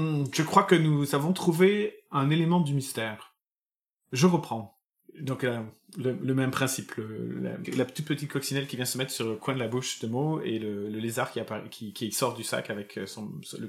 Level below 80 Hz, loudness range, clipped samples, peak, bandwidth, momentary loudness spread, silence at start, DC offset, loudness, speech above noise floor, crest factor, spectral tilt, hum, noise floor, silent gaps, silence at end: -72 dBFS; 6 LU; under 0.1%; -6 dBFS; 16.5 kHz; 14 LU; 0 s; under 0.1%; -29 LUFS; over 62 dB; 22 dB; -5.5 dB/octave; none; under -90 dBFS; 3.46-3.97 s, 4.84-4.90 s; 0 s